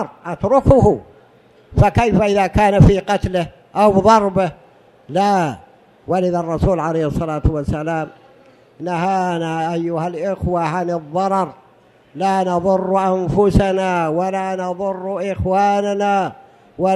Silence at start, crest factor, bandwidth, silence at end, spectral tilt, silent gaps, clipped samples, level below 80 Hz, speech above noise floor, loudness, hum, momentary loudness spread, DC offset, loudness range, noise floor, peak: 0 s; 18 dB; 12.5 kHz; 0 s; -7.5 dB/octave; none; under 0.1%; -32 dBFS; 34 dB; -17 LUFS; none; 11 LU; under 0.1%; 6 LU; -50 dBFS; 0 dBFS